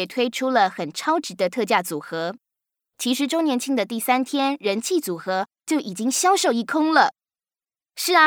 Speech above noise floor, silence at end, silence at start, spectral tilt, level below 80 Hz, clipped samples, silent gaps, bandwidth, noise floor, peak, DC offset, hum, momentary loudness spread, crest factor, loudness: over 69 dB; 0 s; 0 s; -2.5 dB/octave; -82 dBFS; under 0.1%; none; over 20 kHz; under -90 dBFS; -2 dBFS; under 0.1%; none; 9 LU; 20 dB; -22 LUFS